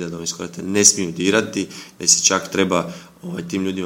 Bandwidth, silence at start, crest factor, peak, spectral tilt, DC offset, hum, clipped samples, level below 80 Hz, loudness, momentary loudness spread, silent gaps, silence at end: 17 kHz; 0 s; 20 dB; 0 dBFS; -2.5 dB/octave; under 0.1%; none; under 0.1%; -58 dBFS; -17 LUFS; 17 LU; none; 0 s